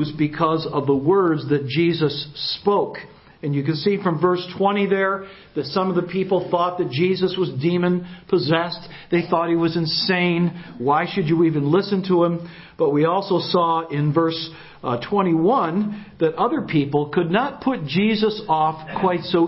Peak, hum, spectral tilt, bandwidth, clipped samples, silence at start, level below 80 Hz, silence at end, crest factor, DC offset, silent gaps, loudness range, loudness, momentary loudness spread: -4 dBFS; none; -10.5 dB/octave; 5.8 kHz; under 0.1%; 0 s; -58 dBFS; 0 s; 16 dB; under 0.1%; none; 2 LU; -21 LUFS; 7 LU